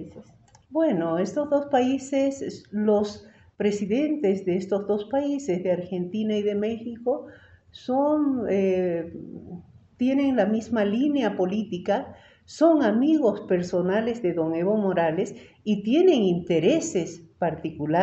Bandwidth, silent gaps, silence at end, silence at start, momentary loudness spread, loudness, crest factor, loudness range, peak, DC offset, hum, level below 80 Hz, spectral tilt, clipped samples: 8.2 kHz; none; 0 s; 0 s; 11 LU; -24 LUFS; 18 dB; 3 LU; -6 dBFS; under 0.1%; none; -64 dBFS; -6.5 dB/octave; under 0.1%